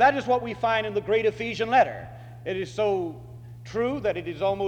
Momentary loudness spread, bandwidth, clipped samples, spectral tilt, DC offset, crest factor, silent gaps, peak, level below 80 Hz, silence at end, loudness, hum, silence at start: 17 LU; 9.6 kHz; under 0.1%; -6 dB/octave; under 0.1%; 18 dB; none; -6 dBFS; -54 dBFS; 0 s; -26 LUFS; none; 0 s